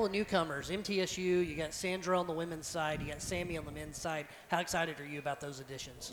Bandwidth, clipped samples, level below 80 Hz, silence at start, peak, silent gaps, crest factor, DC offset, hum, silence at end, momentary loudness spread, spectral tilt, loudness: over 20 kHz; under 0.1%; -56 dBFS; 0 s; -16 dBFS; none; 20 dB; under 0.1%; none; 0 s; 9 LU; -4 dB/octave; -36 LUFS